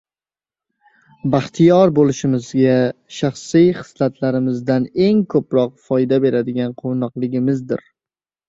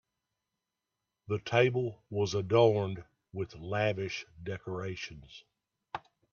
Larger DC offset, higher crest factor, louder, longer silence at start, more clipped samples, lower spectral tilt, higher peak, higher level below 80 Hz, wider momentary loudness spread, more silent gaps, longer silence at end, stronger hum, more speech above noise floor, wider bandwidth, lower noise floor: neither; second, 16 dB vs 22 dB; first, -17 LUFS vs -32 LUFS; about the same, 1.25 s vs 1.3 s; neither; first, -7.5 dB/octave vs -6 dB/octave; first, -2 dBFS vs -12 dBFS; first, -56 dBFS vs -66 dBFS; second, 9 LU vs 19 LU; neither; first, 0.7 s vs 0.35 s; neither; first, over 74 dB vs 56 dB; about the same, 7.8 kHz vs 7.2 kHz; about the same, under -90 dBFS vs -87 dBFS